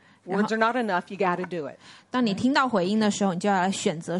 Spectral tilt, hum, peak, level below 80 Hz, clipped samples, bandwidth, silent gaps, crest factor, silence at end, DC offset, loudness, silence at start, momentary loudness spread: -5 dB/octave; none; -6 dBFS; -68 dBFS; under 0.1%; 11.5 kHz; none; 18 dB; 0 s; under 0.1%; -25 LUFS; 0.25 s; 8 LU